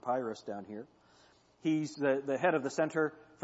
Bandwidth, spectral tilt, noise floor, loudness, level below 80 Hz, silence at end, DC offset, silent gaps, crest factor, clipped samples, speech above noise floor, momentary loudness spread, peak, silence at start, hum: 8 kHz; -6 dB/octave; -65 dBFS; -34 LUFS; -80 dBFS; 0 s; under 0.1%; none; 20 dB; under 0.1%; 31 dB; 13 LU; -16 dBFS; 0 s; none